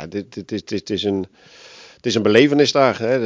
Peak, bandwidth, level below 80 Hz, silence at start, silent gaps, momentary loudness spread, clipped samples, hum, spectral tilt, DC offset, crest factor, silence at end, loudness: 0 dBFS; 8 kHz; -54 dBFS; 0 s; none; 15 LU; under 0.1%; none; -5 dB/octave; under 0.1%; 18 dB; 0 s; -18 LUFS